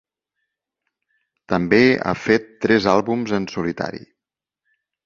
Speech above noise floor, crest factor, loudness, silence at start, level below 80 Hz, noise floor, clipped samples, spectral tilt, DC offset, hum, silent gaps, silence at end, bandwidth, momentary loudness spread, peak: 68 dB; 20 dB; -19 LUFS; 1.5 s; -52 dBFS; -87 dBFS; under 0.1%; -6 dB/octave; under 0.1%; 50 Hz at -55 dBFS; none; 1.05 s; 7.4 kHz; 11 LU; -2 dBFS